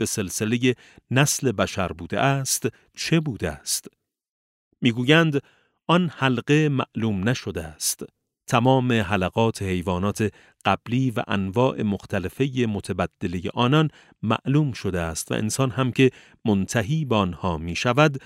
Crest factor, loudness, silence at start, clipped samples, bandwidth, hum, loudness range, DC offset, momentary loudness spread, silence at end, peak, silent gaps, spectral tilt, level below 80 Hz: 20 dB; -23 LUFS; 0 s; under 0.1%; 16 kHz; none; 2 LU; under 0.1%; 8 LU; 0.05 s; -2 dBFS; 4.29-4.71 s; -5 dB/octave; -50 dBFS